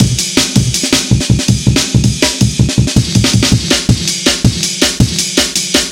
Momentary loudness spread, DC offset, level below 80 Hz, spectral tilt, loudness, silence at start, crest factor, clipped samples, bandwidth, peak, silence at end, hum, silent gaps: 1 LU; 0.2%; -24 dBFS; -3.5 dB/octave; -11 LUFS; 0 s; 12 dB; 0.6%; 17 kHz; 0 dBFS; 0 s; none; none